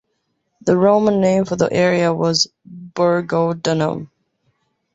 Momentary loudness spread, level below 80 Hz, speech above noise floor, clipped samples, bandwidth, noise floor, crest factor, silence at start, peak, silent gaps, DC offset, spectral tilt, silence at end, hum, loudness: 8 LU; -56 dBFS; 54 dB; under 0.1%; 8 kHz; -70 dBFS; 16 dB; 0.65 s; -2 dBFS; none; under 0.1%; -5.5 dB/octave; 0.9 s; none; -17 LUFS